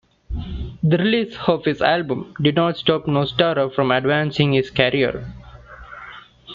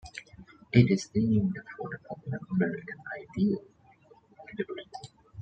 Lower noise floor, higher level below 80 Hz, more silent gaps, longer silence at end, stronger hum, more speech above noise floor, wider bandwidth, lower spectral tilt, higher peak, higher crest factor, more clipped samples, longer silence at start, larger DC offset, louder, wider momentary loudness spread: second, -41 dBFS vs -59 dBFS; first, -40 dBFS vs -60 dBFS; neither; about the same, 0 s vs 0 s; neither; second, 22 dB vs 31 dB; second, 7.2 kHz vs 9 kHz; about the same, -7.5 dB/octave vs -7.5 dB/octave; first, -2 dBFS vs -6 dBFS; second, 18 dB vs 24 dB; neither; first, 0.3 s vs 0.05 s; neither; first, -19 LUFS vs -30 LUFS; second, 16 LU vs 21 LU